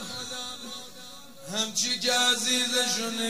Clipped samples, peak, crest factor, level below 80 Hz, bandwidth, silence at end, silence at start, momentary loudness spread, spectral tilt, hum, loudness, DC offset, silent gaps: under 0.1%; -12 dBFS; 18 dB; -68 dBFS; 16 kHz; 0 s; 0 s; 21 LU; -0.5 dB/octave; none; -25 LUFS; 0.4%; none